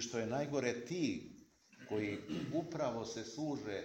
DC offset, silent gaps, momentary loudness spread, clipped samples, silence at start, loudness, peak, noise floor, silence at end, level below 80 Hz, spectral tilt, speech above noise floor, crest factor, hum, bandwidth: under 0.1%; none; 6 LU; under 0.1%; 0 s; -40 LUFS; -20 dBFS; -62 dBFS; 0 s; -72 dBFS; -5 dB/octave; 22 dB; 20 dB; none; 16.5 kHz